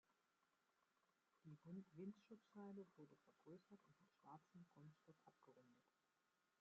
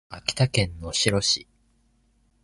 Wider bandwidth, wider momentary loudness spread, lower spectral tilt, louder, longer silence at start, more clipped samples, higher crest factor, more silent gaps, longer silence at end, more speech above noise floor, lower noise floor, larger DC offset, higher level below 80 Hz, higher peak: second, 7 kHz vs 12 kHz; first, 9 LU vs 5 LU; first, -8 dB/octave vs -3.5 dB/octave; second, -63 LUFS vs -24 LUFS; about the same, 0.1 s vs 0.1 s; neither; about the same, 20 dB vs 22 dB; neither; second, 0.7 s vs 1 s; second, 24 dB vs 40 dB; first, -88 dBFS vs -65 dBFS; neither; second, under -90 dBFS vs -46 dBFS; second, -46 dBFS vs -4 dBFS